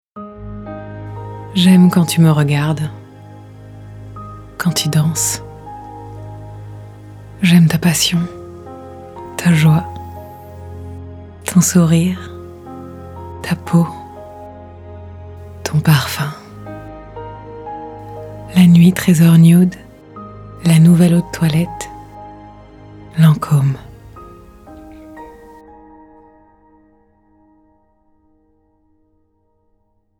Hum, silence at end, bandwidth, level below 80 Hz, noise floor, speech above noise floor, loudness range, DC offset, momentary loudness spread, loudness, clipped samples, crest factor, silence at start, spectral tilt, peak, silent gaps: none; 4.95 s; 15.5 kHz; -44 dBFS; -61 dBFS; 50 dB; 9 LU; under 0.1%; 25 LU; -13 LUFS; under 0.1%; 16 dB; 0.15 s; -5.5 dB/octave; 0 dBFS; none